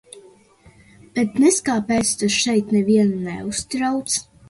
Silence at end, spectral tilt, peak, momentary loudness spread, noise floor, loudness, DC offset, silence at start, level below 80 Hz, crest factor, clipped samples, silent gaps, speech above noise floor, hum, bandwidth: 0.25 s; -4 dB/octave; -4 dBFS; 9 LU; -51 dBFS; -19 LUFS; under 0.1%; 0.15 s; -52 dBFS; 16 dB; under 0.1%; none; 32 dB; none; 11.5 kHz